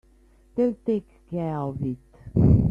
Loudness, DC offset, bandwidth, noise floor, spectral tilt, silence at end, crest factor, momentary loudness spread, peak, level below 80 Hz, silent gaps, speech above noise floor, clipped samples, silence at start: -26 LUFS; under 0.1%; 5.2 kHz; -56 dBFS; -11.5 dB/octave; 0 s; 18 dB; 15 LU; -6 dBFS; -38 dBFS; none; 30 dB; under 0.1%; 0.55 s